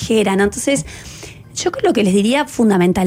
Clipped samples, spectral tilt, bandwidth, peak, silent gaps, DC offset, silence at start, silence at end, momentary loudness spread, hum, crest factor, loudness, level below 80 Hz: under 0.1%; -5 dB/octave; 16 kHz; -4 dBFS; none; under 0.1%; 0 s; 0 s; 17 LU; none; 12 dB; -16 LUFS; -42 dBFS